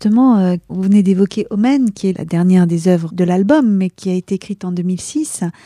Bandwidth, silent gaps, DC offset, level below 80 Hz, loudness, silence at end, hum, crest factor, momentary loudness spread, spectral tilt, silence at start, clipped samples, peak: 12 kHz; none; under 0.1%; -54 dBFS; -15 LUFS; 0.15 s; none; 12 dB; 9 LU; -7 dB/octave; 0 s; under 0.1%; -2 dBFS